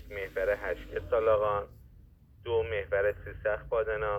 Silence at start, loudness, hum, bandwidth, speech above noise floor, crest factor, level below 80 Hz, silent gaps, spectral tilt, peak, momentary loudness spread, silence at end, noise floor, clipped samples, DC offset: 0 s; -31 LUFS; none; 15 kHz; 26 dB; 16 dB; -48 dBFS; none; -6.5 dB/octave; -14 dBFS; 10 LU; 0 s; -56 dBFS; under 0.1%; under 0.1%